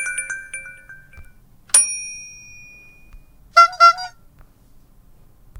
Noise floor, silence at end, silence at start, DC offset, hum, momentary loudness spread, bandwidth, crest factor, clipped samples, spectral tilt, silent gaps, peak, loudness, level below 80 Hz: -49 dBFS; 1.5 s; 0 s; under 0.1%; none; 24 LU; 18 kHz; 22 dB; under 0.1%; 1.5 dB/octave; none; 0 dBFS; -15 LUFS; -50 dBFS